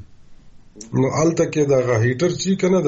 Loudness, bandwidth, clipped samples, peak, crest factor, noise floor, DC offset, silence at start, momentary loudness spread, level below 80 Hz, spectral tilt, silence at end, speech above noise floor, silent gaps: -19 LUFS; 8.2 kHz; under 0.1%; -6 dBFS; 12 dB; -42 dBFS; under 0.1%; 0 s; 4 LU; -50 dBFS; -6 dB/octave; 0 s; 24 dB; none